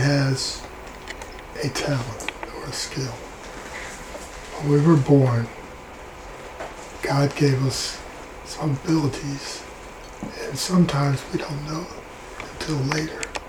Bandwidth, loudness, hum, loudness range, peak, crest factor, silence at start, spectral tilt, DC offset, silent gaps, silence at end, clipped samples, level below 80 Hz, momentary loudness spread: 16 kHz; -24 LUFS; none; 7 LU; -4 dBFS; 20 dB; 0 s; -5.5 dB/octave; under 0.1%; none; 0 s; under 0.1%; -46 dBFS; 19 LU